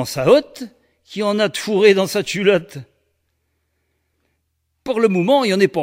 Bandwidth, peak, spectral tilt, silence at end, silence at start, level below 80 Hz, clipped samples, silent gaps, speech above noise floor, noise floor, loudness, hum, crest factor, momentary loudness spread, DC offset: 16 kHz; 0 dBFS; -5 dB/octave; 0 s; 0 s; -58 dBFS; under 0.1%; none; 54 dB; -70 dBFS; -16 LUFS; none; 18 dB; 21 LU; under 0.1%